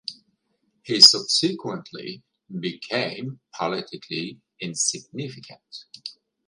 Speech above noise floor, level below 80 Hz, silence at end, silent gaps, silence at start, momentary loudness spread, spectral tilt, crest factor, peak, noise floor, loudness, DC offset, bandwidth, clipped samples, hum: 47 dB; -74 dBFS; 0.35 s; none; 0.1 s; 27 LU; -2 dB/octave; 26 dB; 0 dBFS; -71 dBFS; -19 LUFS; under 0.1%; 16 kHz; under 0.1%; none